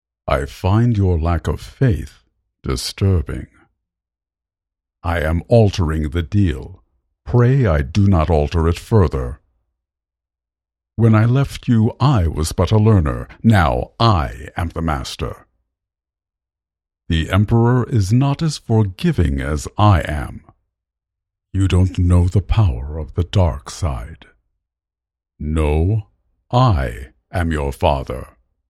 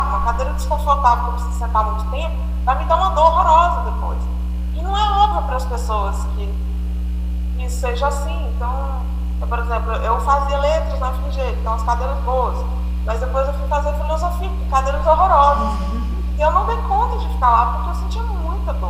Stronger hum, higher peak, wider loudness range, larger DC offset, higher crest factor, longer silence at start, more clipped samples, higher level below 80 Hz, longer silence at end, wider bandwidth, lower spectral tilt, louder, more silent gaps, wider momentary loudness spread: second, none vs 60 Hz at -20 dBFS; about the same, 0 dBFS vs -2 dBFS; about the same, 6 LU vs 6 LU; neither; about the same, 18 dB vs 16 dB; first, 0.25 s vs 0 s; neither; second, -28 dBFS vs -20 dBFS; first, 0.45 s vs 0 s; about the same, 13 kHz vs 12 kHz; about the same, -7 dB/octave vs -6.5 dB/octave; about the same, -18 LUFS vs -19 LUFS; neither; about the same, 12 LU vs 10 LU